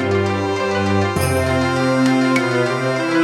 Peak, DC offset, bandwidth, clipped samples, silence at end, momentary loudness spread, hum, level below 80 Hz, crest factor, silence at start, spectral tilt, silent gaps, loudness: -2 dBFS; under 0.1%; 16.5 kHz; under 0.1%; 0 s; 4 LU; none; -50 dBFS; 14 dB; 0 s; -6 dB/octave; none; -17 LUFS